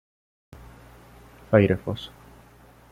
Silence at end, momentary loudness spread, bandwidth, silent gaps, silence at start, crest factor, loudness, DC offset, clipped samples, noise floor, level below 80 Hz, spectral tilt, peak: 0.85 s; 23 LU; 15 kHz; none; 1.5 s; 24 dB; -23 LUFS; under 0.1%; under 0.1%; -52 dBFS; -52 dBFS; -8 dB/octave; -4 dBFS